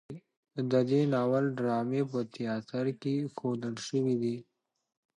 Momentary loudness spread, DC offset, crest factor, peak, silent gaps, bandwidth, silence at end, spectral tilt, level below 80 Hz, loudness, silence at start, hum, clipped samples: 10 LU; under 0.1%; 16 dB; -14 dBFS; 0.37-0.43 s; 10.5 kHz; 0.75 s; -7 dB/octave; -76 dBFS; -31 LUFS; 0.1 s; none; under 0.1%